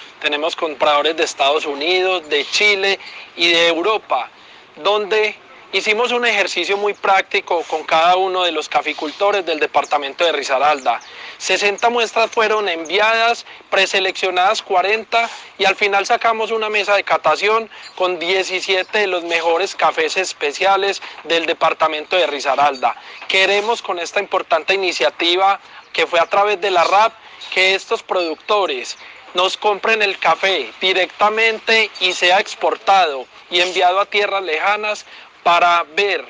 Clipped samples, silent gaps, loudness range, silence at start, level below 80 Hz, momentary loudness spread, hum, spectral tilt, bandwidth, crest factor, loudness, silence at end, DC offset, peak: under 0.1%; none; 2 LU; 0 s; -68 dBFS; 7 LU; none; -1.5 dB/octave; 10 kHz; 14 dB; -16 LUFS; 0 s; under 0.1%; -2 dBFS